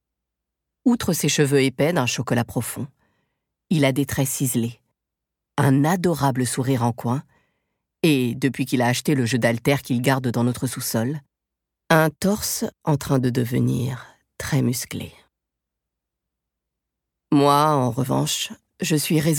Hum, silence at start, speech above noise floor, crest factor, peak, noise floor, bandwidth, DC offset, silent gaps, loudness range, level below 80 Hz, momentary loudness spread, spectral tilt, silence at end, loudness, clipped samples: none; 0.85 s; 63 dB; 20 dB; -2 dBFS; -84 dBFS; 18.5 kHz; under 0.1%; none; 4 LU; -54 dBFS; 10 LU; -5 dB/octave; 0 s; -21 LUFS; under 0.1%